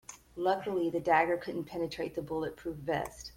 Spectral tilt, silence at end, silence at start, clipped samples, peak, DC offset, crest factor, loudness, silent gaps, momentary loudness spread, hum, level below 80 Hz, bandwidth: -5.5 dB/octave; 0.05 s; 0.1 s; under 0.1%; -14 dBFS; under 0.1%; 20 dB; -33 LUFS; none; 11 LU; none; -60 dBFS; 16.5 kHz